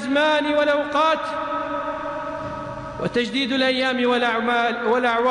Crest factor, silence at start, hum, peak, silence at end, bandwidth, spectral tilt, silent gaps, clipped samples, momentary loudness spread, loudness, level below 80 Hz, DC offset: 12 dB; 0 s; none; -10 dBFS; 0 s; 10.5 kHz; -4.5 dB/octave; none; under 0.1%; 10 LU; -21 LUFS; -52 dBFS; under 0.1%